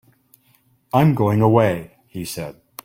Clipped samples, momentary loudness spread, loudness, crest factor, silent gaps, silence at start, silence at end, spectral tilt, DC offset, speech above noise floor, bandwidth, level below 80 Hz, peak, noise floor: under 0.1%; 17 LU; -18 LUFS; 18 dB; none; 0.95 s; 0.35 s; -7.5 dB/octave; under 0.1%; 42 dB; 16.5 kHz; -52 dBFS; -2 dBFS; -60 dBFS